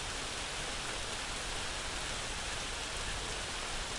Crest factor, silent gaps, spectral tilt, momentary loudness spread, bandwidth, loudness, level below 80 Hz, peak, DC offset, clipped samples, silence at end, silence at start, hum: 16 dB; none; -1.5 dB/octave; 0 LU; 11.5 kHz; -37 LUFS; -46 dBFS; -24 dBFS; under 0.1%; under 0.1%; 0 s; 0 s; none